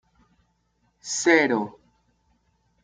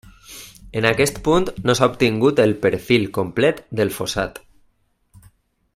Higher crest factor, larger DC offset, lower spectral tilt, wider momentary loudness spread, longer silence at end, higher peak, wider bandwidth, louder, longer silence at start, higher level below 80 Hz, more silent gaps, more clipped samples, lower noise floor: about the same, 24 dB vs 20 dB; neither; second, -3 dB/octave vs -5 dB/octave; first, 18 LU vs 13 LU; second, 1.15 s vs 1.4 s; second, -4 dBFS vs 0 dBFS; second, 9.6 kHz vs 16 kHz; about the same, -21 LUFS vs -19 LUFS; first, 1.05 s vs 0.3 s; second, -70 dBFS vs -44 dBFS; neither; neither; first, -69 dBFS vs -62 dBFS